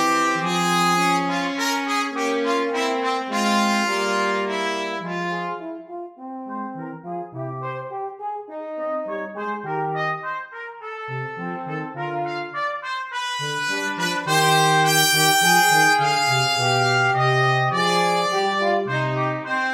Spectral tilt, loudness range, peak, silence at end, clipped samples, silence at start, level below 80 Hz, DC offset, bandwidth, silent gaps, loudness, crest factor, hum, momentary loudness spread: -3.5 dB/octave; 13 LU; -4 dBFS; 0 s; under 0.1%; 0 s; -68 dBFS; under 0.1%; 17 kHz; none; -21 LUFS; 18 dB; none; 16 LU